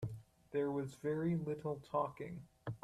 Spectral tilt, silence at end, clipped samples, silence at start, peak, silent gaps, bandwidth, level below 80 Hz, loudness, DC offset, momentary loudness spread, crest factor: -8.5 dB/octave; 0.05 s; under 0.1%; 0 s; -24 dBFS; none; 13.5 kHz; -68 dBFS; -41 LUFS; under 0.1%; 12 LU; 16 dB